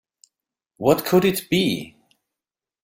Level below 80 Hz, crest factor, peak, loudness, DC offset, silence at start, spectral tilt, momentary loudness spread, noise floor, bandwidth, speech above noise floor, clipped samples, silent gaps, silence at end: -58 dBFS; 20 dB; -4 dBFS; -20 LUFS; under 0.1%; 0.8 s; -5 dB/octave; 11 LU; -89 dBFS; 16.5 kHz; 70 dB; under 0.1%; none; 0.95 s